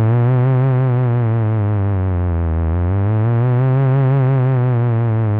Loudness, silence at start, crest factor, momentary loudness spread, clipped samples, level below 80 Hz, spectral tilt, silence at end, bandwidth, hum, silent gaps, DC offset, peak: -16 LUFS; 0 s; 6 dB; 4 LU; under 0.1%; -32 dBFS; -13 dB/octave; 0 s; 3.6 kHz; none; none; under 0.1%; -10 dBFS